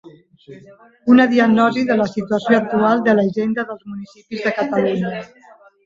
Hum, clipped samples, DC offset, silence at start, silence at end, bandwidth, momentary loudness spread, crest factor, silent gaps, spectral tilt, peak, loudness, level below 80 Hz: none; under 0.1%; under 0.1%; 0.05 s; 0.6 s; 7.6 kHz; 16 LU; 18 dB; none; -7 dB/octave; 0 dBFS; -17 LUFS; -60 dBFS